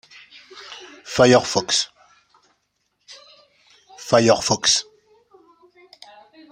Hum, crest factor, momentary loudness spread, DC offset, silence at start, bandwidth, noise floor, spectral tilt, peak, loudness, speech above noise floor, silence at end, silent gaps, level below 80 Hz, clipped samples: none; 22 dB; 23 LU; under 0.1%; 0.55 s; 16 kHz; -71 dBFS; -3 dB/octave; -2 dBFS; -18 LUFS; 54 dB; 1.7 s; none; -58 dBFS; under 0.1%